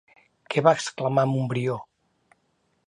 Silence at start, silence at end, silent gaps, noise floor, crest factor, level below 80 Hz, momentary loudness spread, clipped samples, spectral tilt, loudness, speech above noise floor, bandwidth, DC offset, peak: 0.5 s; 1.05 s; none; -70 dBFS; 22 dB; -70 dBFS; 8 LU; under 0.1%; -6 dB/octave; -24 LUFS; 47 dB; 11 kHz; under 0.1%; -4 dBFS